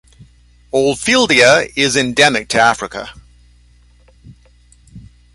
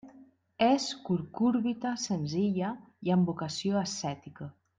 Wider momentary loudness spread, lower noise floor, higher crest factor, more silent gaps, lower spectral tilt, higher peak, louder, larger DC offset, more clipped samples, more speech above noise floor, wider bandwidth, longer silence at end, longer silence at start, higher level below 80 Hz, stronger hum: first, 15 LU vs 10 LU; second, -48 dBFS vs -58 dBFS; about the same, 16 dB vs 18 dB; neither; second, -2.5 dB/octave vs -5.5 dB/octave; first, 0 dBFS vs -14 dBFS; first, -12 LUFS vs -30 LUFS; neither; neither; first, 35 dB vs 28 dB; first, 16 kHz vs 9.4 kHz; about the same, 0.35 s vs 0.3 s; first, 0.2 s vs 0.05 s; first, -46 dBFS vs -70 dBFS; first, 60 Hz at -45 dBFS vs none